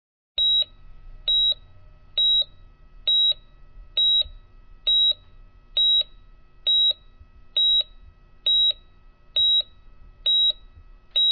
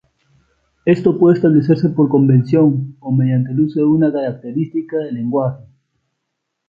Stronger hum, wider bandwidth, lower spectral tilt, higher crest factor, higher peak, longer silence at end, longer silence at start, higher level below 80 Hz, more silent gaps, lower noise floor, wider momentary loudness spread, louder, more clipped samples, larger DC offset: neither; second, 4.7 kHz vs 5.4 kHz; second, 2.5 dB/octave vs -11 dB/octave; about the same, 10 dB vs 14 dB; second, -14 dBFS vs -2 dBFS; second, 0 s vs 1.05 s; second, 0.4 s vs 0.85 s; first, -48 dBFS vs -56 dBFS; neither; second, -50 dBFS vs -75 dBFS; about the same, 11 LU vs 10 LU; second, -20 LUFS vs -15 LUFS; neither; neither